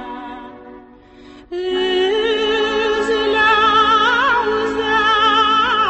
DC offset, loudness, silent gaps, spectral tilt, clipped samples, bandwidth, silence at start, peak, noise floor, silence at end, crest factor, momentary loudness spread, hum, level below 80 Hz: under 0.1%; -15 LUFS; none; -3 dB/octave; under 0.1%; 8.4 kHz; 0 s; -2 dBFS; -42 dBFS; 0 s; 14 dB; 15 LU; none; -46 dBFS